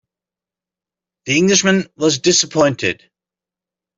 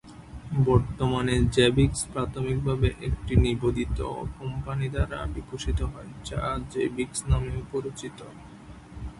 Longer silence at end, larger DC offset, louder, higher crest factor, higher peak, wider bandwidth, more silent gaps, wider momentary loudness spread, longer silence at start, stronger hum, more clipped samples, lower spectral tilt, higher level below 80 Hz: first, 1.05 s vs 0 s; neither; first, -15 LUFS vs -27 LUFS; about the same, 18 dB vs 20 dB; first, 0 dBFS vs -6 dBFS; second, 7.8 kHz vs 11.5 kHz; neither; second, 9 LU vs 18 LU; first, 1.25 s vs 0.05 s; neither; neither; second, -3 dB/octave vs -6 dB/octave; second, -58 dBFS vs -34 dBFS